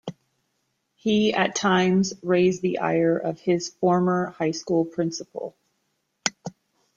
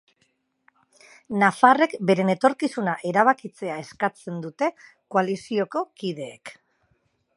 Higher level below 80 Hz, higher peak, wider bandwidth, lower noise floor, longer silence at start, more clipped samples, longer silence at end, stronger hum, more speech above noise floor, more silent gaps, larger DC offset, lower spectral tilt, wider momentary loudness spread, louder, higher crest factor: first, -64 dBFS vs -74 dBFS; about the same, -2 dBFS vs -2 dBFS; second, 7.8 kHz vs 11.5 kHz; first, -74 dBFS vs -70 dBFS; second, 0.05 s vs 1.3 s; neither; second, 0.45 s vs 0.85 s; neither; first, 52 dB vs 47 dB; neither; neither; about the same, -5 dB/octave vs -6 dB/octave; about the same, 14 LU vs 16 LU; about the same, -23 LUFS vs -23 LUFS; about the same, 22 dB vs 22 dB